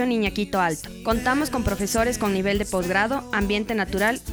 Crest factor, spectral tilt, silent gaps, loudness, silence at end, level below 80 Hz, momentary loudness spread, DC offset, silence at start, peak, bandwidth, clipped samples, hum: 16 dB; -4.5 dB/octave; none; -23 LUFS; 0 s; -38 dBFS; 3 LU; under 0.1%; 0 s; -8 dBFS; over 20 kHz; under 0.1%; none